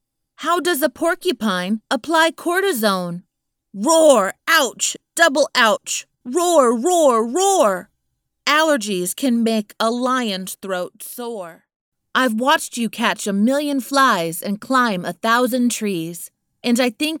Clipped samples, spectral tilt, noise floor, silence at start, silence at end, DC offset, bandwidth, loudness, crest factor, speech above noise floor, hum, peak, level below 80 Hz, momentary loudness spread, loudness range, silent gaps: under 0.1%; -3 dB/octave; -73 dBFS; 0.4 s; 0 s; under 0.1%; 19.5 kHz; -18 LUFS; 18 dB; 55 dB; none; 0 dBFS; -68 dBFS; 11 LU; 5 LU; 11.76-11.92 s